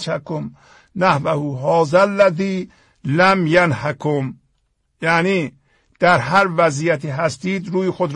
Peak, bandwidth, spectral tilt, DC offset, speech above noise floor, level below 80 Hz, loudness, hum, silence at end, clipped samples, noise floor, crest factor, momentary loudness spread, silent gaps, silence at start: -2 dBFS; 10.5 kHz; -6 dB/octave; under 0.1%; 49 dB; -56 dBFS; -17 LUFS; none; 0 s; under 0.1%; -66 dBFS; 16 dB; 14 LU; none; 0 s